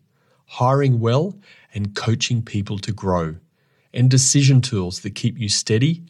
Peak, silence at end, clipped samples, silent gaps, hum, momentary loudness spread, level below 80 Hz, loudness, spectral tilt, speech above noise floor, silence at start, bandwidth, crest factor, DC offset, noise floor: -4 dBFS; 0.05 s; under 0.1%; none; none; 14 LU; -54 dBFS; -19 LUFS; -5 dB/octave; 43 dB; 0.5 s; 12 kHz; 16 dB; under 0.1%; -62 dBFS